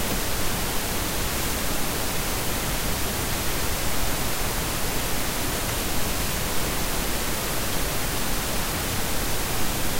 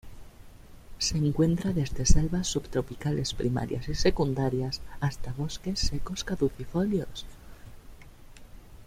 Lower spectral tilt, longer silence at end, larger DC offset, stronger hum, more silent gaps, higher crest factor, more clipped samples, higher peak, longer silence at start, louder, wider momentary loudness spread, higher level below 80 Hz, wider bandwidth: second, -3 dB/octave vs -5 dB/octave; about the same, 0 s vs 0.05 s; neither; neither; neither; second, 12 dB vs 22 dB; neither; second, -12 dBFS vs -6 dBFS; about the same, 0 s vs 0.05 s; first, -26 LUFS vs -29 LUFS; second, 0 LU vs 8 LU; about the same, -32 dBFS vs -36 dBFS; about the same, 16 kHz vs 15 kHz